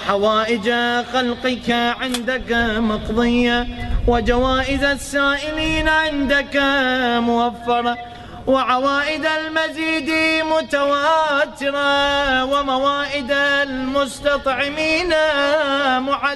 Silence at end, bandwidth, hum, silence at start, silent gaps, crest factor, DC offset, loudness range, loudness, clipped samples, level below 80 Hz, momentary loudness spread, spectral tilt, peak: 0 s; 12 kHz; none; 0 s; none; 16 dB; 0.1%; 2 LU; -18 LUFS; under 0.1%; -34 dBFS; 4 LU; -4 dB/octave; -4 dBFS